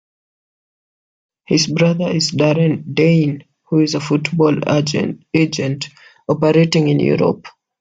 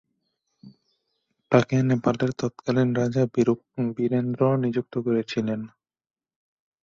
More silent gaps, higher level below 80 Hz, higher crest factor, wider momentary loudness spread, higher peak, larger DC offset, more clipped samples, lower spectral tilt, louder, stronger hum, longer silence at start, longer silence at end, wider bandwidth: neither; first, -56 dBFS vs -62 dBFS; second, 16 dB vs 22 dB; about the same, 9 LU vs 7 LU; about the same, 0 dBFS vs -2 dBFS; neither; neither; second, -6 dB/octave vs -7.5 dB/octave; first, -16 LUFS vs -24 LUFS; neither; first, 1.5 s vs 0.65 s; second, 0.3 s vs 1.15 s; about the same, 7.8 kHz vs 7.4 kHz